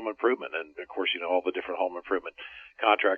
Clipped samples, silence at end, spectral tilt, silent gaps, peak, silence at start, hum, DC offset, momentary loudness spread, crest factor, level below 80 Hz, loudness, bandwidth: under 0.1%; 0 s; -5 dB/octave; none; -6 dBFS; 0 s; none; under 0.1%; 13 LU; 22 dB; -70 dBFS; -29 LUFS; 4.8 kHz